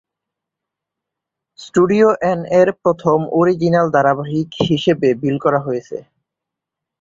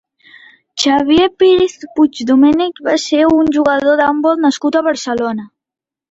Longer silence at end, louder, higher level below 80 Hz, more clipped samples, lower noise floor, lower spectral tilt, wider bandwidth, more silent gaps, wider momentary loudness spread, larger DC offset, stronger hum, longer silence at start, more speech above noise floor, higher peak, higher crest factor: first, 1 s vs 0.65 s; second, -16 LUFS vs -13 LUFS; second, -54 dBFS vs -48 dBFS; neither; about the same, -83 dBFS vs -86 dBFS; first, -7 dB/octave vs -4 dB/octave; about the same, 7.8 kHz vs 8 kHz; neither; about the same, 8 LU vs 7 LU; neither; neither; first, 1.6 s vs 0.75 s; second, 68 dB vs 74 dB; about the same, -2 dBFS vs -2 dBFS; about the same, 16 dB vs 12 dB